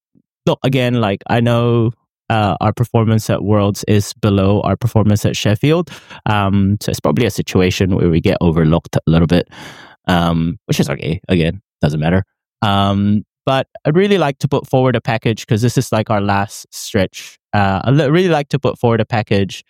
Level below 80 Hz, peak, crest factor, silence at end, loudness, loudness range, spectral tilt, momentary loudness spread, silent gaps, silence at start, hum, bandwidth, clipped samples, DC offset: -38 dBFS; 0 dBFS; 14 dB; 0.1 s; -15 LUFS; 2 LU; -6.5 dB/octave; 6 LU; 2.11-2.15 s, 12.47-12.52 s, 13.31-13.36 s; 0.45 s; none; 16.5 kHz; under 0.1%; under 0.1%